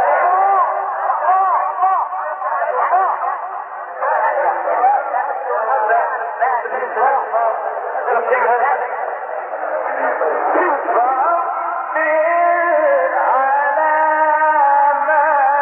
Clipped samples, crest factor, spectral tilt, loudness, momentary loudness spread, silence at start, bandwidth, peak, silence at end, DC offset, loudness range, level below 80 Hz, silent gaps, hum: under 0.1%; 12 dB; -7.5 dB/octave; -16 LUFS; 8 LU; 0 s; 3.4 kHz; -4 dBFS; 0 s; under 0.1%; 4 LU; under -90 dBFS; none; none